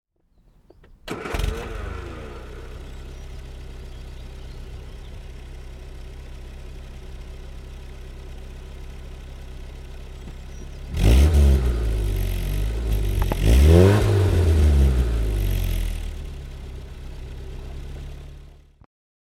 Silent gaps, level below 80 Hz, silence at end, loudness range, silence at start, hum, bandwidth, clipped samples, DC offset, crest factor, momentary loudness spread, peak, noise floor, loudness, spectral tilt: none; -26 dBFS; 0.85 s; 21 LU; 1.05 s; none; 15.5 kHz; under 0.1%; under 0.1%; 22 dB; 23 LU; 0 dBFS; -59 dBFS; -21 LUFS; -7 dB/octave